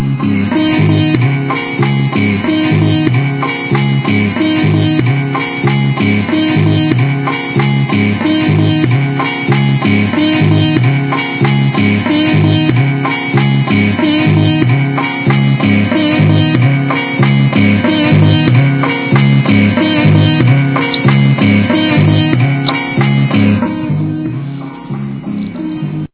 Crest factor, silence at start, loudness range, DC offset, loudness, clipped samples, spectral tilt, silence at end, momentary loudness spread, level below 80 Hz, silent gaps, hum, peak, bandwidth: 10 dB; 0 s; 3 LU; under 0.1%; -11 LUFS; 0.1%; -11 dB/octave; 0.05 s; 6 LU; -38 dBFS; none; none; 0 dBFS; 4 kHz